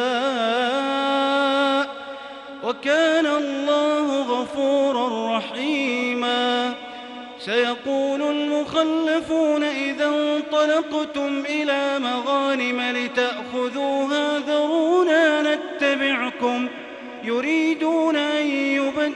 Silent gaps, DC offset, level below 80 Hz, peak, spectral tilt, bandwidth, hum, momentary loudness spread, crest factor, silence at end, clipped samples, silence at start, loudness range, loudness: none; under 0.1%; -66 dBFS; -8 dBFS; -3 dB/octave; 10.5 kHz; none; 7 LU; 14 dB; 0 s; under 0.1%; 0 s; 2 LU; -21 LUFS